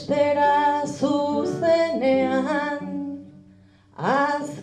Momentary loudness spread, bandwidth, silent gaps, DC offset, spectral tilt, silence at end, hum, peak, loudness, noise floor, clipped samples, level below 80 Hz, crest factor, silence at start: 11 LU; 10 kHz; none; under 0.1%; -5.5 dB/octave; 0 s; none; -8 dBFS; -22 LUFS; -52 dBFS; under 0.1%; -64 dBFS; 14 dB; 0 s